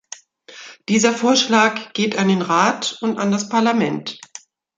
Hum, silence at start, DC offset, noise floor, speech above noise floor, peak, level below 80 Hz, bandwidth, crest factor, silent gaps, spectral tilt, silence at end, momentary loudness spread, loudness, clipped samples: none; 0.5 s; under 0.1%; -43 dBFS; 26 dB; -2 dBFS; -66 dBFS; 9.4 kHz; 18 dB; none; -4 dB/octave; 0.6 s; 22 LU; -18 LUFS; under 0.1%